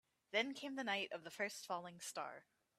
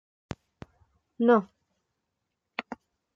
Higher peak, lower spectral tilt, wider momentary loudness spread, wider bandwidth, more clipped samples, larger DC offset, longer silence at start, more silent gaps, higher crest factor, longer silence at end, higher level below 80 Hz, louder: second, -24 dBFS vs -10 dBFS; second, -2.5 dB/octave vs -7.5 dB/octave; second, 9 LU vs 22 LU; first, 15.5 kHz vs 7.4 kHz; neither; neither; second, 0.3 s vs 1.2 s; neither; about the same, 22 dB vs 22 dB; about the same, 0.35 s vs 0.4 s; second, under -90 dBFS vs -66 dBFS; second, -44 LUFS vs -27 LUFS